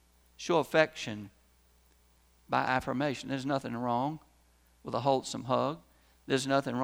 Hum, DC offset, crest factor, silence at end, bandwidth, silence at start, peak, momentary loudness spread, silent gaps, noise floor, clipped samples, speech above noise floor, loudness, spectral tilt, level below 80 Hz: none; under 0.1%; 24 dB; 0 s; over 20 kHz; 0.4 s; -10 dBFS; 15 LU; none; -65 dBFS; under 0.1%; 34 dB; -32 LUFS; -5 dB/octave; -64 dBFS